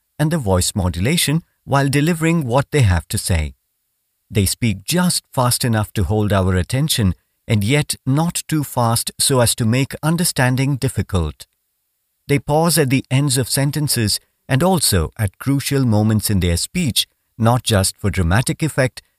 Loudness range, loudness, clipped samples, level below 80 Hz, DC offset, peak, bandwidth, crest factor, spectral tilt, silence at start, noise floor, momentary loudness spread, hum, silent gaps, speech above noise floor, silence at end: 2 LU; -18 LUFS; under 0.1%; -36 dBFS; under 0.1%; -2 dBFS; 16 kHz; 16 dB; -4.5 dB/octave; 0.2 s; -70 dBFS; 6 LU; none; none; 53 dB; 0.3 s